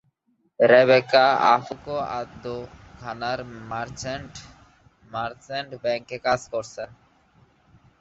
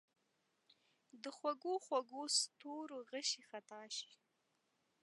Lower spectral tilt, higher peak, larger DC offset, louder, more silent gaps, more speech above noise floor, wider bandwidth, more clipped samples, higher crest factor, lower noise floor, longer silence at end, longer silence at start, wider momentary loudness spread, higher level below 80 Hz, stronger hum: first, -4.5 dB/octave vs 0 dB/octave; first, -4 dBFS vs -24 dBFS; neither; first, -23 LUFS vs -42 LUFS; neither; first, 46 dB vs 40 dB; second, 8 kHz vs 11.5 kHz; neither; about the same, 22 dB vs 22 dB; second, -69 dBFS vs -83 dBFS; first, 1.15 s vs 0.9 s; second, 0.6 s vs 1.15 s; first, 20 LU vs 16 LU; first, -56 dBFS vs under -90 dBFS; neither